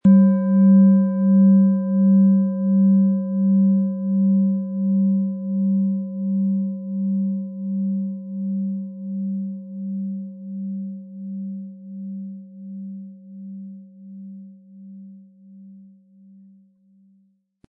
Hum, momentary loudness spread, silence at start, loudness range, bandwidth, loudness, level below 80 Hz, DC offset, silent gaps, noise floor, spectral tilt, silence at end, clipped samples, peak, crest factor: none; 22 LU; 0.05 s; 22 LU; 1.7 kHz; -20 LUFS; -70 dBFS; under 0.1%; none; -62 dBFS; -14.5 dB/octave; 1.9 s; under 0.1%; -6 dBFS; 14 dB